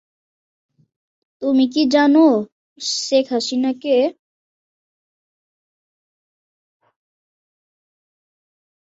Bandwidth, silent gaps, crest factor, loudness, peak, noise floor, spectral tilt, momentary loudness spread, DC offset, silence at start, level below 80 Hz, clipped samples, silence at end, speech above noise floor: 8 kHz; 2.52-2.76 s; 18 dB; -17 LUFS; -4 dBFS; under -90 dBFS; -3.5 dB/octave; 11 LU; under 0.1%; 1.4 s; -70 dBFS; under 0.1%; 4.7 s; over 74 dB